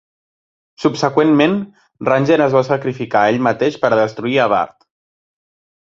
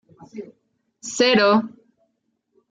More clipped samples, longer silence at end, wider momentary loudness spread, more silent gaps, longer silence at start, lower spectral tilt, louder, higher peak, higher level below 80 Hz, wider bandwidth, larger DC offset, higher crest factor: neither; first, 1.15 s vs 1 s; second, 7 LU vs 23 LU; neither; first, 0.8 s vs 0.35 s; first, -6.5 dB/octave vs -3.5 dB/octave; first, -15 LUFS vs -18 LUFS; about the same, -2 dBFS vs -4 dBFS; first, -58 dBFS vs -70 dBFS; second, 7.6 kHz vs 9.4 kHz; neither; about the same, 16 dB vs 18 dB